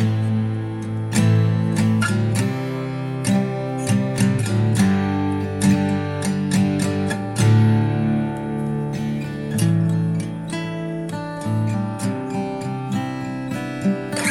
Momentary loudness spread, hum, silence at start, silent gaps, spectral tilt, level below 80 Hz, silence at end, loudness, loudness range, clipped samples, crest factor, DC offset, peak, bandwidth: 9 LU; none; 0 s; none; -6.5 dB/octave; -50 dBFS; 0 s; -21 LUFS; 5 LU; under 0.1%; 14 dB; under 0.1%; -6 dBFS; 13 kHz